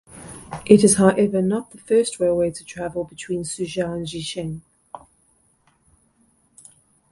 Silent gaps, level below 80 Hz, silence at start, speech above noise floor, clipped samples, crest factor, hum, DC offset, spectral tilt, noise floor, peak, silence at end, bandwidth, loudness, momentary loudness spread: none; -54 dBFS; 0.1 s; 42 dB; under 0.1%; 22 dB; none; under 0.1%; -5 dB/octave; -62 dBFS; 0 dBFS; 2.15 s; 11.5 kHz; -20 LUFS; 23 LU